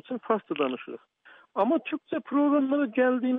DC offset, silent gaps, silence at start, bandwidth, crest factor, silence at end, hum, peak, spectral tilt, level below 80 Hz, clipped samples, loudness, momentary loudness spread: under 0.1%; none; 0.1 s; 3.9 kHz; 16 dB; 0 s; none; -12 dBFS; -9 dB/octave; -84 dBFS; under 0.1%; -27 LUFS; 13 LU